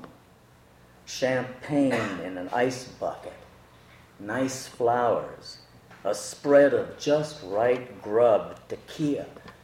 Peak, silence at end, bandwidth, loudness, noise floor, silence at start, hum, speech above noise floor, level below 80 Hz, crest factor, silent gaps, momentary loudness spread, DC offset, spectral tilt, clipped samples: -8 dBFS; 0.1 s; 15.5 kHz; -26 LUFS; -56 dBFS; 0 s; none; 30 dB; -64 dBFS; 20 dB; none; 18 LU; under 0.1%; -5 dB/octave; under 0.1%